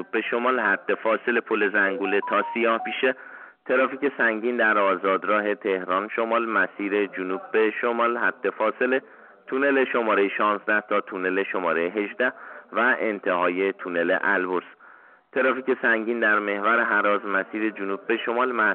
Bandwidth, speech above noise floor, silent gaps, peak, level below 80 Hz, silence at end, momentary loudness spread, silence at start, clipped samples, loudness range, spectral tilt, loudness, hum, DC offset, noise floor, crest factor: 4.3 kHz; 28 dB; none; -10 dBFS; -78 dBFS; 0 s; 5 LU; 0 s; under 0.1%; 1 LU; -2 dB/octave; -23 LUFS; none; under 0.1%; -51 dBFS; 14 dB